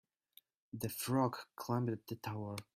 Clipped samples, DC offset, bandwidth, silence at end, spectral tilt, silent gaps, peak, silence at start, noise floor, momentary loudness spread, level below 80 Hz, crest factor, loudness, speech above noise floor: under 0.1%; under 0.1%; 16 kHz; 0.15 s; -6 dB/octave; none; -22 dBFS; 0.75 s; -69 dBFS; 10 LU; -74 dBFS; 20 dB; -39 LUFS; 30 dB